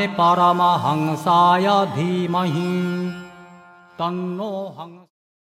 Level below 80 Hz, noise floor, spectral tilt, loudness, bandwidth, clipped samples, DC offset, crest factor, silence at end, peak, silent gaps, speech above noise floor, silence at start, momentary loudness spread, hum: -66 dBFS; -46 dBFS; -6.5 dB/octave; -19 LUFS; 15 kHz; under 0.1%; under 0.1%; 16 dB; 0.6 s; -4 dBFS; none; 27 dB; 0 s; 15 LU; none